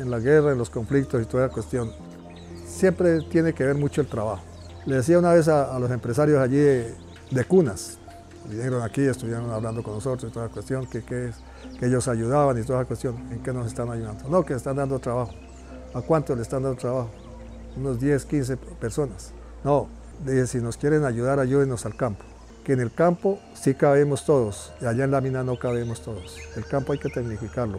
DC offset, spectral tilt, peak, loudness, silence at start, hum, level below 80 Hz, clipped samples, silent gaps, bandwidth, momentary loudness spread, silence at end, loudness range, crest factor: under 0.1%; -7 dB/octave; -8 dBFS; -24 LUFS; 0 s; none; -46 dBFS; under 0.1%; none; 14 kHz; 17 LU; 0 s; 6 LU; 16 dB